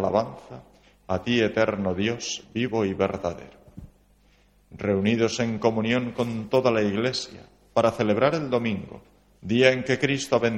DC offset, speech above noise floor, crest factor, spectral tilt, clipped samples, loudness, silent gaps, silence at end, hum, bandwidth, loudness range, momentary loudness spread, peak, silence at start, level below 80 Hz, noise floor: under 0.1%; 35 dB; 22 dB; -5.5 dB/octave; under 0.1%; -25 LUFS; none; 0 s; 50 Hz at -55 dBFS; 12.5 kHz; 4 LU; 12 LU; -2 dBFS; 0 s; -56 dBFS; -60 dBFS